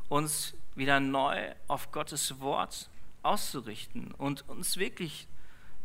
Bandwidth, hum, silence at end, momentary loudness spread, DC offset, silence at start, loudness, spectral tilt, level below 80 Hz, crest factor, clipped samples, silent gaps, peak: 16 kHz; none; 0 s; 14 LU; under 0.1%; 0 s; -33 LUFS; -3 dB/octave; -58 dBFS; 24 dB; under 0.1%; none; -8 dBFS